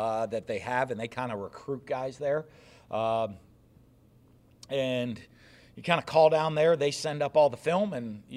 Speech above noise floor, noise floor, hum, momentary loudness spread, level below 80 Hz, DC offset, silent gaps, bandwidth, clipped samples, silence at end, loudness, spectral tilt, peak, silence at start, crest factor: 31 dB; -59 dBFS; none; 14 LU; -66 dBFS; under 0.1%; none; 13 kHz; under 0.1%; 0 s; -29 LUFS; -5.5 dB/octave; -8 dBFS; 0 s; 22 dB